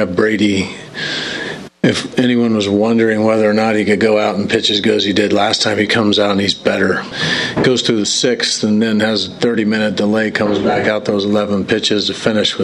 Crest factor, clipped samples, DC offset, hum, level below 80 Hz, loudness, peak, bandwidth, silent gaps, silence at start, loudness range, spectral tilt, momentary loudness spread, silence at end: 14 dB; under 0.1%; under 0.1%; none; -52 dBFS; -14 LUFS; 0 dBFS; 11.5 kHz; none; 0 s; 2 LU; -4 dB/octave; 4 LU; 0 s